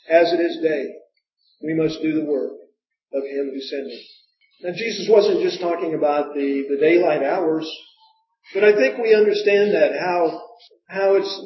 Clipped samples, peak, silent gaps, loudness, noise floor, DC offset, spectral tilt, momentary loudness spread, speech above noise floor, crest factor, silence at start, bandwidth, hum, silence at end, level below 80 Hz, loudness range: under 0.1%; -2 dBFS; none; -20 LUFS; -66 dBFS; under 0.1%; -5.5 dB/octave; 15 LU; 47 dB; 18 dB; 0.1 s; 6 kHz; none; 0 s; -68 dBFS; 8 LU